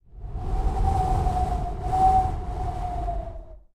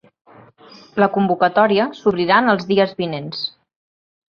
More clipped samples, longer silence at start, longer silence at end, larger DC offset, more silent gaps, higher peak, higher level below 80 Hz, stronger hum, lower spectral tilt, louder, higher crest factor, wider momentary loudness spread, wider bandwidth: neither; second, 0.15 s vs 0.95 s; second, 0.15 s vs 0.8 s; neither; neither; second, -10 dBFS vs 0 dBFS; first, -28 dBFS vs -60 dBFS; neither; about the same, -7.5 dB/octave vs -7 dB/octave; second, -26 LUFS vs -17 LUFS; about the same, 16 dB vs 18 dB; first, 15 LU vs 11 LU; first, 11.5 kHz vs 6.8 kHz